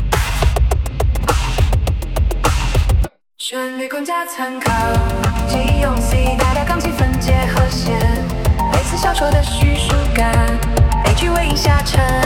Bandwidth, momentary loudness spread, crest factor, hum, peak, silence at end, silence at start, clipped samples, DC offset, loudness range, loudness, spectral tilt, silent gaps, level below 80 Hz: 17.5 kHz; 6 LU; 14 dB; none; 0 dBFS; 0 s; 0 s; under 0.1%; under 0.1%; 4 LU; -17 LUFS; -5 dB/octave; none; -18 dBFS